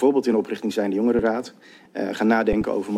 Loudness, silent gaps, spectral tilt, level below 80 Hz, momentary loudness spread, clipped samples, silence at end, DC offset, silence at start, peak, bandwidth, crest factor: -22 LUFS; none; -6.5 dB/octave; -46 dBFS; 10 LU; under 0.1%; 0 s; under 0.1%; 0 s; -6 dBFS; 13.5 kHz; 16 dB